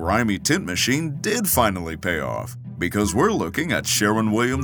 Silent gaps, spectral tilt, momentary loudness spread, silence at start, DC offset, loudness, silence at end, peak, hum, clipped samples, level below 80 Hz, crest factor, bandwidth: none; -4 dB/octave; 8 LU; 0 s; under 0.1%; -21 LUFS; 0 s; -4 dBFS; none; under 0.1%; -46 dBFS; 18 dB; over 20 kHz